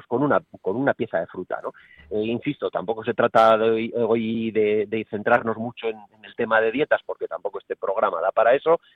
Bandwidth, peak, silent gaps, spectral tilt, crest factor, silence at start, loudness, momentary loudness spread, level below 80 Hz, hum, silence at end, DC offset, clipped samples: 7 kHz; -4 dBFS; none; -7.5 dB/octave; 18 dB; 0.1 s; -23 LUFS; 13 LU; -64 dBFS; none; 0.2 s; under 0.1%; under 0.1%